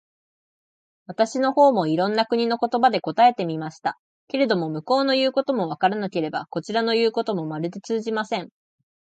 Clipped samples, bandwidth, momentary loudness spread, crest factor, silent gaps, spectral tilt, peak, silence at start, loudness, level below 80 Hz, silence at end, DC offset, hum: under 0.1%; 9 kHz; 11 LU; 18 dB; 3.99-4.27 s; -5.5 dB/octave; -6 dBFS; 1.1 s; -22 LUFS; -74 dBFS; 0.75 s; under 0.1%; none